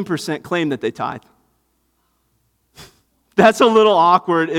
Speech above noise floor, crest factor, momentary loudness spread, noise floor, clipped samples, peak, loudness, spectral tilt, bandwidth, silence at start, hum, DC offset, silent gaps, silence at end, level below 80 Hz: 50 dB; 18 dB; 14 LU; -65 dBFS; under 0.1%; 0 dBFS; -16 LUFS; -5 dB/octave; 15 kHz; 0 s; none; under 0.1%; none; 0 s; -60 dBFS